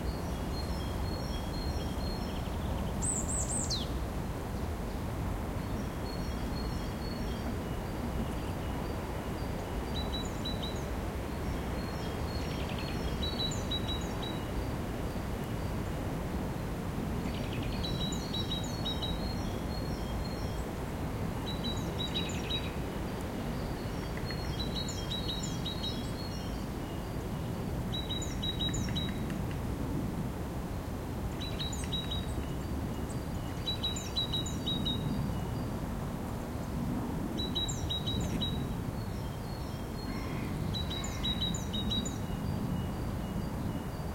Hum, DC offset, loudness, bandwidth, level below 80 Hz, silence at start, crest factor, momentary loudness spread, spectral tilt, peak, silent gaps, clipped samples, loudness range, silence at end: none; under 0.1%; -36 LUFS; 16.5 kHz; -42 dBFS; 0 s; 14 dB; 5 LU; -5 dB/octave; -20 dBFS; none; under 0.1%; 2 LU; 0 s